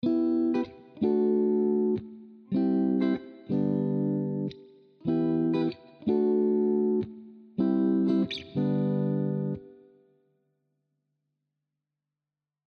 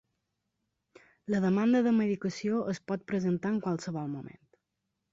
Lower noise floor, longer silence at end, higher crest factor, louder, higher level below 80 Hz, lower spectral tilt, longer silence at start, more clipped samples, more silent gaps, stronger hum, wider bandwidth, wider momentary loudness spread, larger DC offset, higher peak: first, -90 dBFS vs -84 dBFS; first, 3 s vs 0.85 s; about the same, 14 dB vs 14 dB; about the same, -28 LUFS vs -30 LUFS; about the same, -68 dBFS vs -70 dBFS; first, -10 dB/octave vs -7 dB/octave; second, 0.05 s vs 1.3 s; neither; neither; neither; second, 6.2 kHz vs 7.8 kHz; second, 10 LU vs 13 LU; neither; first, -14 dBFS vs -18 dBFS